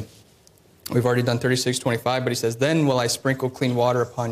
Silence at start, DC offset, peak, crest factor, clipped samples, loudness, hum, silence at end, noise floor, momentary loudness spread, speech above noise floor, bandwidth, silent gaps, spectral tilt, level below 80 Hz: 0 s; under 0.1%; -8 dBFS; 14 dB; under 0.1%; -22 LUFS; none; 0 s; -55 dBFS; 4 LU; 33 dB; 15.5 kHz; none; -5 dB/octave; -60 dBFS